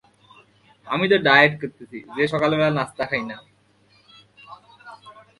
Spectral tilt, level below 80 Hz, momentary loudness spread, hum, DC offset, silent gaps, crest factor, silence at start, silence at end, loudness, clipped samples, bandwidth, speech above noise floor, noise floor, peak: -6 dB/octave; -62 dBFS; 20 LU; none; under 0.1%; none; 24 dB; 0.85 s; 0.3 s; -19 LUFS; under 0.1%; 11.5 kHz; 38 dB; -59 dBFS; 0 dBFS